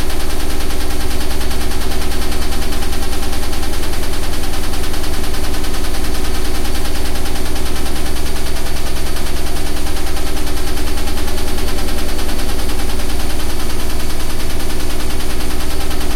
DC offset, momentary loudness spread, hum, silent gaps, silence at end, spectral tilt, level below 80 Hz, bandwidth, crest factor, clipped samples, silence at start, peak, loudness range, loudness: under 0.1%; 1 LU; none; none; 0 s; -4 dB/octave; -16 dBFS; 15 kHz; 8 dB; under 0.1%; 0 s; -2 dBFS; 1 LU; -22 LUFS